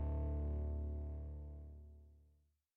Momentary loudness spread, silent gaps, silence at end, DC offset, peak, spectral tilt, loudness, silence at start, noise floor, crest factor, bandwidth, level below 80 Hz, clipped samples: 18 LU; none; 0.55 s; under 0.1%; -34 dBFS; -12 dB/octave; -45 LUFS; 0 s; -75 dBFS; 10 dB; 2.3 kHz; -44 dBFS; under 0.1%